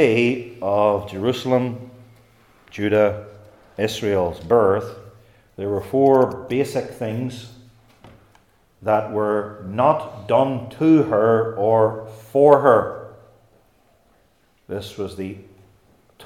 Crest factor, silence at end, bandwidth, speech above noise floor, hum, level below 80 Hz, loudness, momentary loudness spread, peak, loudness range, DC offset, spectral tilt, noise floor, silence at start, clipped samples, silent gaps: 20 dB; 0 s; 15.5 kHz; 42 dB; none; -58 dBFS; -20 LUFS; 17 LU; 0 dBFS; 7 LU; under 0.1%; -7 dB/octave; -60 dBFS; 0 s; under 0.1%; none